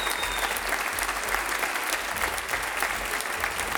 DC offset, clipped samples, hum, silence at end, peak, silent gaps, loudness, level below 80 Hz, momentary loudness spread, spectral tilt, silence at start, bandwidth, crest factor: under 0.1%; under 0.1%; none; 0 s; -6 dBFS; none; -27 LUFS; -46 dBFS; 2 LU; -0.5 dB/octave; 0 s; over 20 kHz; 22 dB